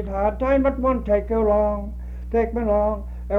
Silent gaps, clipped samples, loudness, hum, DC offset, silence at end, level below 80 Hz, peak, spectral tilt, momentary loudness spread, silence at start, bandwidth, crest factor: none; under 0.1%; -22 LUFS; 60 Hz at -30 dBFS; under 0.1%; 0 s; -30 dBFS; -8 dBFS; -10 dB/octave; 10 LU; 0 s; 4 kHz; 14 dB